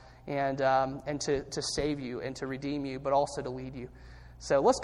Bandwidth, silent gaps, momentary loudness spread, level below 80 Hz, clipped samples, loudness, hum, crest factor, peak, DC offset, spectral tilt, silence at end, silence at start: 12 kHz; none; 16 LU; -52 dBFS; under 0.1%; -31 LUFS; none; 18 dB; -12 dBFS; under 0.1%; -4.5 dB/octave; 0 s; 0 s